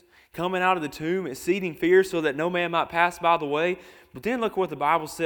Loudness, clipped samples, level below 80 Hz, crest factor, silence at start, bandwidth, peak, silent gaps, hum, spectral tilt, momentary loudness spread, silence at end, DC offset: -25 LUFS; under 0.1%; -60 dBFS; 20 dB; 0.35 s; 19 kHz; -6 dBFS; none; none; -5 dB/octave; 8 LU; 0 s; under 0.1%